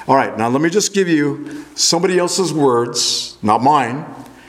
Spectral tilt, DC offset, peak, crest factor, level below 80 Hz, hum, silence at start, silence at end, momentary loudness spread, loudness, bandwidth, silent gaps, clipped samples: -3.5 dB/octave; under 0.1%; 0 dBFS; 16 dB; -60 dBFS; none; 0 s; 0.2 s; 9 LU; -15 LUFS; 16 kHz; none; under 0.1%